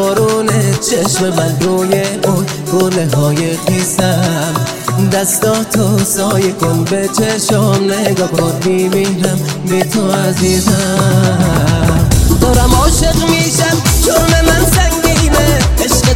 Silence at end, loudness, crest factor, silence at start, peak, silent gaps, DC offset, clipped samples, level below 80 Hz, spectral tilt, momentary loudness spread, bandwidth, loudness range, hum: 0 s; -12 LUFS; 12 dB; 0 s; 0 dBFS; none; 0.5%; under 0.1%; -20 dBFS; -4.5 dB/octave; 4 LU; 17 kHz; 3 LU; none